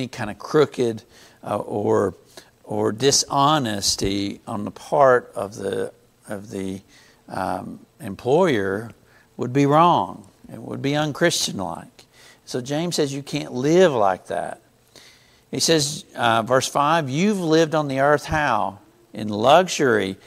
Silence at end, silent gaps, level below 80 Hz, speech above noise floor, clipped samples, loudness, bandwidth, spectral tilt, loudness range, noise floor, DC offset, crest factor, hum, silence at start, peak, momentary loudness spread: 0.1 s; none; -52 dBFS; 31 dB; under 0.1%; -21 LUFS; 16 kHz; -4 dB/octave; 5 LU; -52 dBFS; under 0.1%; 20 dB; none; 0 s; 0 dBFS; 16 LU